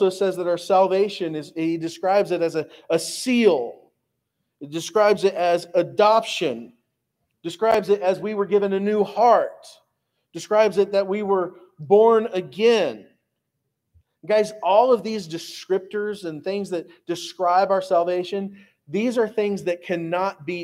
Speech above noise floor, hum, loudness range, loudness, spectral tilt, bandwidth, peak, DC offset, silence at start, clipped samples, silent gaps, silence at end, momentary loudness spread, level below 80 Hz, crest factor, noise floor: 57 dB; none; 3 LU; -21 LUFS; -5 dB/octave; 15.5 kHz; -4 dBFS; under 0.1%; 0 s; under 0.1%; none; 0 s; 13 LU; -72 dBFS; 18 dB; -78 dBFS